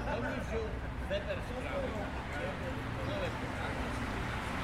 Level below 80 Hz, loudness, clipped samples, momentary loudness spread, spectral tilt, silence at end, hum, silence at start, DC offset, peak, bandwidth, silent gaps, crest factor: -44 dBFS; -38 LUFS; under 0.1%; 2 LU; -6 dB/octave; 0 s; none; 0 s; under 0.1%; -22 dBFS; 15.5 kHz; none; 14 dB